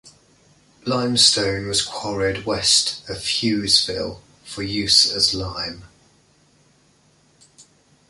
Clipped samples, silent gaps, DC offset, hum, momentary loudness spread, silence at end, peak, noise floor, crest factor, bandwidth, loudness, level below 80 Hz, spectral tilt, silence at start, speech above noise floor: under 0.1%; none; under 0.1%; none; 15 LU; 0.5 s; -2 dBFS; -58 dBFS; 22 dB; 12 kHz; -18 LUFS; -48 dBFS; -2 dB/octave; 0.05 s; 37 dB